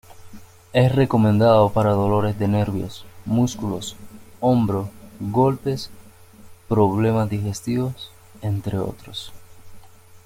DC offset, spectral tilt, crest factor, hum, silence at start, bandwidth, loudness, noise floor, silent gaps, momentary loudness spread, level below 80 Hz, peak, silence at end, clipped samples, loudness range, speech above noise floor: under 0.1%; -7.5 dB/octave; 18 dB; none; 0.1 s; 16 kHz; -21 LUFS; -45 dBFS; none; 17 LU; -48 dBFS; -4 dBFS; 0.1 s; under 0.1%; 5 LU; 25 dB